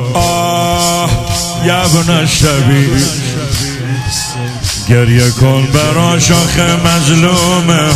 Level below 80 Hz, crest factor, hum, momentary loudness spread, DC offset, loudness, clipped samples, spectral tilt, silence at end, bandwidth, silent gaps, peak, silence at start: -28 dBFS; 10 dB; none; 7 LU; under 0.1%; -10 LUFS; 0.2%; -4.5 dB/octave; 0 s; 16 kHz; none; 0 dBFS; 0 s